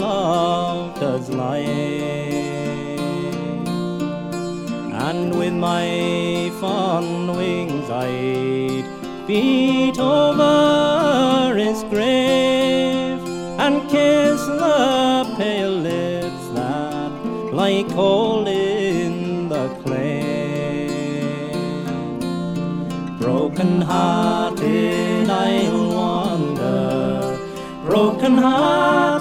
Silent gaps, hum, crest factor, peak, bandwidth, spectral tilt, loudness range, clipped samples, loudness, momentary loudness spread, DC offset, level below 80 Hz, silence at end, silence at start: none; none; 16 dB; -4 dBFS; 16 kHz; -6 dB/octave; 7 LU; under 0.1%; -19 LUFS; 10 LU; under 0.1%; -50 dBFS; 0 s; 0 s